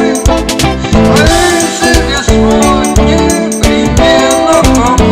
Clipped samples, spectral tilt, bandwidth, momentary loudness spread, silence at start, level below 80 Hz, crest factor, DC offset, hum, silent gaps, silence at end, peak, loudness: 1%; -4.5 dB/octave; 16.5 kHz; 4 LU; 0 s; -16 dBFS; 8 dB; under 0.1%; none; none; 0 s; 0 dBFS; -8 LUFS